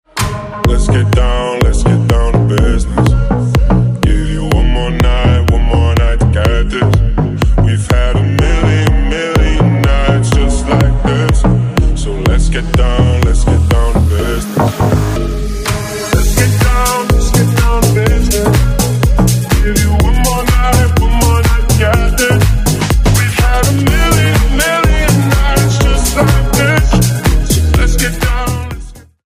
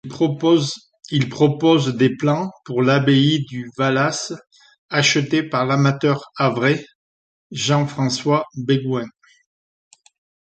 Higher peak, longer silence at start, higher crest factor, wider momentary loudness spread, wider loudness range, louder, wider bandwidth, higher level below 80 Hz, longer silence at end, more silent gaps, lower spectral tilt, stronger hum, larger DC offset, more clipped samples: about the same, 0 dBFS vs -2 dBFS; about the same, 0.15 s vs 0.05 s; second, 10 dB vs 16 dB; second, 4 LU vs 10 LU; second, 2 LU vs 5 LU; first, -12 LUFS vs -19 LUFS; first, 16 kHz vs 9 kHz; first, -14 dBFS vs -60 dBFS; second, 0.25 s vs 1.45 s; second, none vs 4.78-4.89 s, 6.95-7.50 s; about the same, -5.5 dB/octave vs -5.5 dB/octave; neither; neither; neither